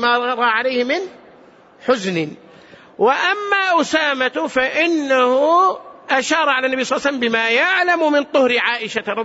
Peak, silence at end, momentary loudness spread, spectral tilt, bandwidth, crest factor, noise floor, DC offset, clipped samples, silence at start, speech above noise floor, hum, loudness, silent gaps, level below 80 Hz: -4 dBFS; 0 s; 7 LU; -3.5 dB/octave; 8 kHz; 14 dB; -46 dBFS; under 0.1%; under 0.1%; 0 s; 30 dB; none; -17 LUFS; none; -62 dBFS